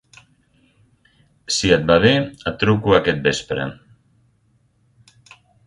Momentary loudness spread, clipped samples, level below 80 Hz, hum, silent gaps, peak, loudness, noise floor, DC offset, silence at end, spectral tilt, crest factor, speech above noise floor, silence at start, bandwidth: 12 LU; under 0.1%; -44 dBFS; none; none; 0 dBFS; -18 LUFS; -61 dBFS; under 0.1%; 1.9 s; -4.5 dB/octave; 20 dB; 44 dB; 1.5 s; 11.5 kHz